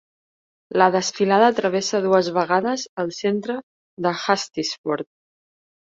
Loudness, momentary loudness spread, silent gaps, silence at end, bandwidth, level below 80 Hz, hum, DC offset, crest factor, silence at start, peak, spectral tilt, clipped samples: -21 LUFS; 11 LU; 2.89-2.97 s, 3.63-3.97 s, 4.78-4.84 s; 0.85 s; 7.8 kHz; -68 dBFS; none; under 0.1%; 20 dB; 0.7 s; -2 dBFS; -4 dB/octave; under 0.1%